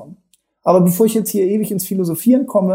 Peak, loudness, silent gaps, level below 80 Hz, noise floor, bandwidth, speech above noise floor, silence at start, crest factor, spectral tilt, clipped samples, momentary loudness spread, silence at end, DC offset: -2 dBFS; -16 LUFS; none; -64 dBFS; -60 dBFS; 16.5 kHz; 45 dB; 0 s; 14 dB; -7 dB/octave; under 0.1%; 6 LU; 0 s; under 0.1%